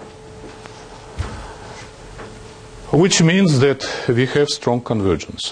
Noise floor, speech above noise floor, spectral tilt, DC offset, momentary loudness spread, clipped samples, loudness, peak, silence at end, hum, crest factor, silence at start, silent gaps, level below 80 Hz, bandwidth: -37 dBFS; 21 dB; -5 dB/octave; under 0.1%; 24 LU; under 0.1%; -17 LUFS; -2 dBFS; 0 s; none; 16 dB; 0 s; none; -42 dBFS; 10.5 kHz